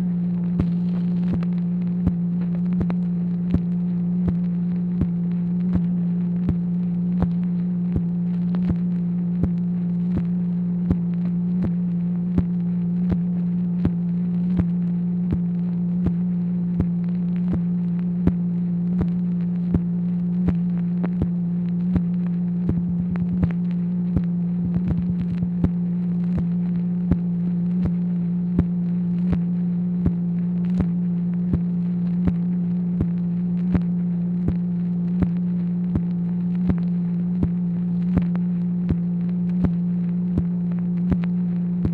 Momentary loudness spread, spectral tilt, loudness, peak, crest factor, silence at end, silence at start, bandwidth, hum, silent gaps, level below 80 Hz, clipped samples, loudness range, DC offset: 2 LU; -12 dB/octave; -23 LUFS; -4 dBFS; 18 dB; 0 s; 0 s; 2.8 kHz; none; none; -40 dBFS; under 0.1%; 0 LU; under 0.1%